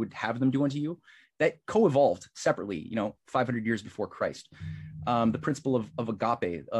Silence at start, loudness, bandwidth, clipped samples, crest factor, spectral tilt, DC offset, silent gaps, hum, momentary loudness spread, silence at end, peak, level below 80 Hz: 0 s; -29 LUFS; 11.5 kHz; under 0.1%; 18 dB; -6.5 dB/octave; under 0.1%; none; none; 11 LU; 0 s; -12 dBFS; -64 dBFS